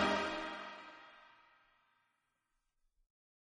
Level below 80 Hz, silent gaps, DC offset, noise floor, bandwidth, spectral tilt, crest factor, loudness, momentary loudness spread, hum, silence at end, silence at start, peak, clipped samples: -68 dBFS; none; under 0.1%; -84 dBFS; 9.6 kHz; -4 dB/octave; 24 dB; -40 LUFS; 23 LU; none; 2.3 s; 0 s; -22 dBFS; under 0.1%